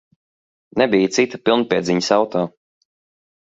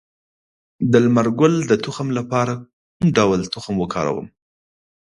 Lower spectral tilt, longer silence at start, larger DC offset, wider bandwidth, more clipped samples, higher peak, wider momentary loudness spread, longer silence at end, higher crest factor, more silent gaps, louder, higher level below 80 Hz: second, -4.5 dB/octave vs -6.5 dB/octave; about the same, 0.75 s vs 0.8 s; neither; second, 7.8 kHz vs 11 kHz; neither; about the same, 0 dBFS vs 0 dBFS; about the same, 8 LU vs 9 LU; about the same, 0.95 s vs 0.85 s; about the same, 20 dB vs 20 dB; second, none vs 2.73-3.00 s; about the same, -18 LUFS vs -19 LUFS; second, -60 dBFS vs -52 dBFS